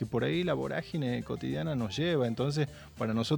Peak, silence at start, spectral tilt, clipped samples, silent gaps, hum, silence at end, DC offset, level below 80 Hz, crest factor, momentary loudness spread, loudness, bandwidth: -16 dBFS; 0 s; -6.5 dB/octave; under 0.1%; none; none; 0 s; under 0.1%; -58 dBFS; 16 dB; 5 LU; -32 LUFS; 19 kHz